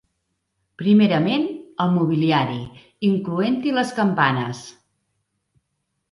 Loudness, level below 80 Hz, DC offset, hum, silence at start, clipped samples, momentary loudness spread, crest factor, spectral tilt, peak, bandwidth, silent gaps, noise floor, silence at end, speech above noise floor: -20 LUFS; -62 dBFS; under 0.1%; none; 0.8 s; under 0.1%; 11 LU; 20 dB; -7 dB/octave; -2 dBFS; 11.5 kHz; none; -75 dBFS; 1.4 s; 56 dB